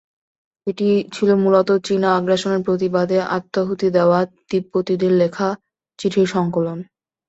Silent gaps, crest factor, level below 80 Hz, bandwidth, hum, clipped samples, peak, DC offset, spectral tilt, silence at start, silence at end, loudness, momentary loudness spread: none; 16 dB; -60 dBFS; 8 kHz; none; under 0.1%; -2 dBFS; under 0.1%; -6.5 dB/octave; 0.65 s; 0.45 s; -19 LUFS; 9 LU